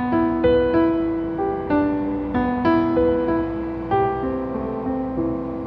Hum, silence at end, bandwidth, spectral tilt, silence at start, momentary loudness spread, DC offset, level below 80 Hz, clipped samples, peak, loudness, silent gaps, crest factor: none; 0 s; 5.2 kHz; -10 dB/octave; 0 s; 7 LU; under 0.1%; -40 dBFS; under 0.1%; -8 dBFS; -21 LUFS; none; 14 dB